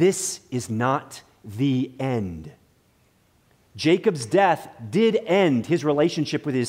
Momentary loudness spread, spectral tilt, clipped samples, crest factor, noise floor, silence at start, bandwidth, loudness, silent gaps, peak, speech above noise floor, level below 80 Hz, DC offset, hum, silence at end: 10 LU; -5.5 dB/octave; under 0.1%; 18 dB; -62 dBFS; 0 s; 16 kHz; -23 LUFS; none; -6 dBFS; 39 dB; -60 dBFS; under 0.1%; none; 0 s